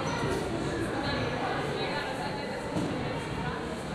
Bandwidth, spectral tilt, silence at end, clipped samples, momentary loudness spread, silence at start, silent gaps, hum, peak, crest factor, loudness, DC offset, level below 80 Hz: 14.5 kHz; -5.5 dB/octave; 0 s; under 0.1%; 3 LU; 0 s; none; none; -18 dBFS; 14 dB; -32 LUFS; under 0.1%; -48 dBFS